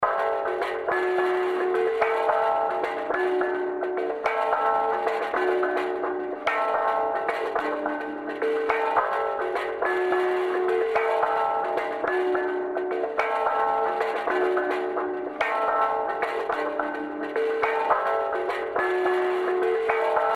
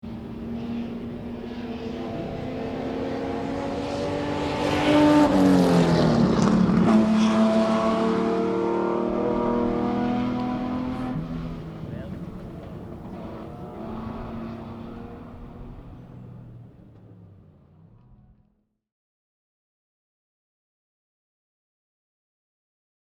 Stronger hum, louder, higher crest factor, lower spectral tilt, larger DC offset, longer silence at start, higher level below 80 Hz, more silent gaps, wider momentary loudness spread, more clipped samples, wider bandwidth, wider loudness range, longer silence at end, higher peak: neither; about the same, -25 LUFS vs -24 LUFS; about the same, 18 dB vs 20 dB; second, -4.5 dB/octave vs -7 dB/octave; neither; about the same, 0 s vs 0.05 s; second, -64 dBFS vs -46 dBFS; neither; second, 5 LU vs 20 LU; neither; second, 11 kHz vs 12.5 kHz; second, 2 LU vs 19 LU; second, 0 s vs 5.75 s; about the same, -6 dBFS vs -4 dBFS